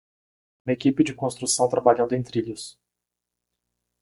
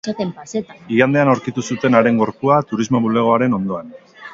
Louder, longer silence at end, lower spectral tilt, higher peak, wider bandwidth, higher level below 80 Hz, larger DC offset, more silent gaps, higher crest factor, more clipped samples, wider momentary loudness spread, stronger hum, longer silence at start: second, -23 LUFS vs -17 LUFS; first, 1.35 s vs 0 s; second, -4.5 dB/octave vs -6.5 dB/octave; second, -4 dBFS vs 0 dBFS; first, 11.5 kHz vs 7.8 kHz; second, -62 dBFS vs -56 dBFS; neither; neither; first, 22 dB vs 16 dB; neither; first, 16 LU vs 12 LU; first, 60 Hz at -45 dBFS vs none; first, 0.65 s vs 0.05 s